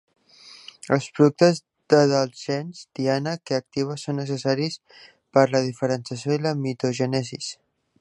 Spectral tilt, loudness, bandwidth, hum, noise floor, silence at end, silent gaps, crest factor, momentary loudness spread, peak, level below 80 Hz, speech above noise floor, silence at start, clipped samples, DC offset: -6 dB/octave; -23 LUFS; 11.5 kHz; none; -49 dBFS; 0.45 s; none; 22 dB; 13 LU; -2 dBFS; -68 dBFS; 26 dB; 0.45 s; under 0.1%; under 0.1%